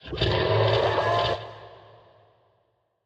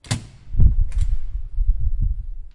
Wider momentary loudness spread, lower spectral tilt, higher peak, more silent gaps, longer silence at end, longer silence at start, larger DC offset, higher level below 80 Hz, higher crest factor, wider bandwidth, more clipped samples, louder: first, 16 LU vs 12 LU; about the same, -6.5 dB/octave vs -5.5 dB/octave; second, -10 dBFS vs -2 dBFS; neither; first, 1.3 s vs 0.05 s; about the same, 0.05 s vs 0.05 s; neither; second, -46 dBFS vs -20 dBFS; about the same, 16 dB vs 16 dB; second, 8.2 kHz vs 11.5 kHz; neither; about the same, -24 LUFS vs -25 LUFS